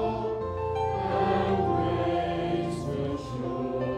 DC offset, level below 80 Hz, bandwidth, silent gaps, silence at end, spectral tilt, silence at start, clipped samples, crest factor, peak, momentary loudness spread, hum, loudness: under 0.1%; -50 dBFS; 11 kHz; none; 0 s; -7.5 dB/octave; 0 s; under 0.1%; 14 dB; -14 dBFS; 6 LU; none; -29 LUFS